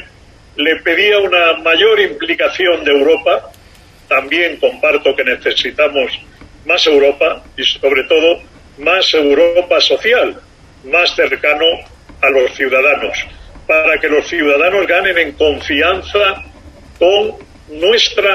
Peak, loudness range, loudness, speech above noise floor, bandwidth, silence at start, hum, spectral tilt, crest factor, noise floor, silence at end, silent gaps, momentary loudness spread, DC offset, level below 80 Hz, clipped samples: 0 dBFS; 2 LU; -12 LUFS; 30 dB; 14 kHz; 0 s; none; -2.5 dB/octave; 14 dB; -42 dBFS; 0 s; none; 6 LU; under 0.1%; -42 dBFS; under 0.1%